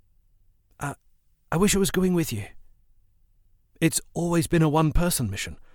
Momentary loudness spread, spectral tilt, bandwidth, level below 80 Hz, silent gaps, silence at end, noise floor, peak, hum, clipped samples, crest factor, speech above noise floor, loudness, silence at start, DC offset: 14 LU; -5 dB/octave; 19 kHz; -38 dBFS; none; 0.2 s; -62 dBFS; -8 dBFS; none; under 0.1%; 18 dB; 38 dB; -24 LUFS; 0.8 s; under 0.1%